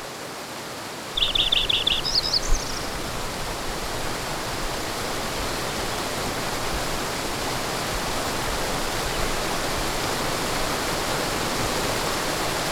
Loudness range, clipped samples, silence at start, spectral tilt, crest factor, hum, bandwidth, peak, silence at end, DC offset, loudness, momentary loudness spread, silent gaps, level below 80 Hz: 5 LU; under 0.1%; 0 s; -2.5 dB/octave; 18 dB; none; 19 kHz; -8 dBFS; 0 s; under 0.1%; -25 LUFS; 9 LU; none; -34 dBFS